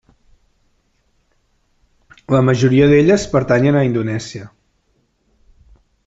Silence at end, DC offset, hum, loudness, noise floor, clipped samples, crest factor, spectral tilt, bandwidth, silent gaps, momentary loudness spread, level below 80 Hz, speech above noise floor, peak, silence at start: 1.6 s; under 0.1%; none; -14 LUFS; -63 dBFS; under 0.1%; 16 dB; -7 dB/octave; 8 kHz; none; 14 LU; -44 dBFS; 49 dB; -2 dBFS; 2.3 s